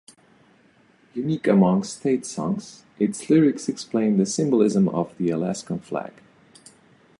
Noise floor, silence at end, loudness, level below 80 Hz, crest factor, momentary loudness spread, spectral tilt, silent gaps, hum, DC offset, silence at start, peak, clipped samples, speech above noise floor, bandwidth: -58 dBFS; 1.1 s; -23 LUFS; -64 dBFS; 18 dB; 12 LU; -6.5 dB/octave; none; none; under 0.1%; 1.15 s; -6 dBFS; under 0.1%; 36 dB; 11.5 kHz